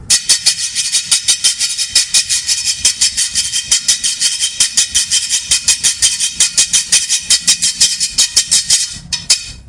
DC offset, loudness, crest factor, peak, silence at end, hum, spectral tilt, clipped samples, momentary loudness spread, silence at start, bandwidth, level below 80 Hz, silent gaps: under 0.1%; -10 LUFS; 14 dB; 0 dBFS; 0.05 s; none; 2.5 dB/octave; 0.3%; 4 LU; 0 s; 12 kHz; -44 dBFS; none